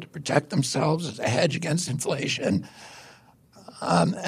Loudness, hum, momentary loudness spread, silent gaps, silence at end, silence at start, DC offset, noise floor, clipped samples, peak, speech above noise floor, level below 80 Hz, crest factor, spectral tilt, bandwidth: -25 LUFS; none; 17 LU; none; 0 s; 0 s; under 0.1%; -54 dBFS; under 0.1%; -6 dBFS; 29 dB; -62 dBFS; 20 dB; -5 dB/octave; 14.5 kHz